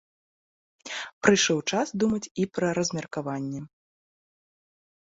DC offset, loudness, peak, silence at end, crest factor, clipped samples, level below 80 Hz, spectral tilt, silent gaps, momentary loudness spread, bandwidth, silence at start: under 0.1%; -26 LUFS; -4 dBFS; 1.45 s; 24 dB; under 0.1%; -64 dBFS; -4 dB/octave; 1.13-1.21 s, 2.31-2.35 s; 14 LU; 8 kHz; 0.85 s